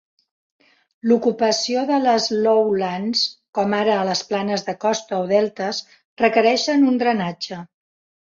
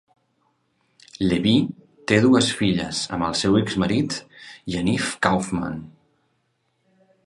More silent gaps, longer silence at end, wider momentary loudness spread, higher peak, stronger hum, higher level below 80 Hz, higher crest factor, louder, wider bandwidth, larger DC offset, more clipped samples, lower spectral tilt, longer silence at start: first, 3.49-3.53 s, 6.05-6.17 s vs none; second, 0.6 s vs 1.35 s; second, 9 LU vs 14 LU; about the same, -4 dBFS vs -2 dBFS; neither; second, -66 dBFS vs -50 dBFS; about the same, 18 dB vs 22 dB; about the same, -20 LUFS vs -21 LUFS; second, 7.6 kHz vs 11.5 kHz; neither; neither; about the same, -4 dB/octave vs -5 dB/octave; about the same, 1.05 s vs 1.15 s